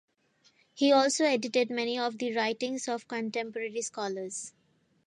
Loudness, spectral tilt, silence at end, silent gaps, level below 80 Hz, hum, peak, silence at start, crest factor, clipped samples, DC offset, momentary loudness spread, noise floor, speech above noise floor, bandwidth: -30 LUFS; -2.5 dB/octave; 0.55 s; none; -84 dBFS; none; -12 dBFS; 0.75 s; 18 dB; under 0.1%; under 0.1%; 12 LU; -68 dBFS; 38 dB; 11.5 kHz